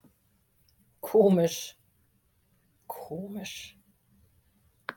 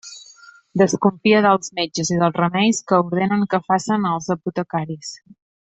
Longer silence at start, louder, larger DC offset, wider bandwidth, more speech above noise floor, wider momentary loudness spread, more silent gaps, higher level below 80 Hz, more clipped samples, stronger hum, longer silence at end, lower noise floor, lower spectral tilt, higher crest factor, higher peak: first, 1.05 s vs 0.05 s; second, -27 LUFS vs -19 LUFS; neither; first, 17.5 kHz vs 8.4 kHz; first, 43 dB vs 28 dB; first, 21 LU vs 13 LU; neither; second, -70 dBFS vs -60 dBFS; neither; neither; second, 0.05 s vs 0.5 s; first, -69 dBFS vs -47 dBFS; about the same, -6 dB/octave vs -5 dB/octave; first, 22 dB vs 16 dB; second, -10 dBFS vs -2 dBFS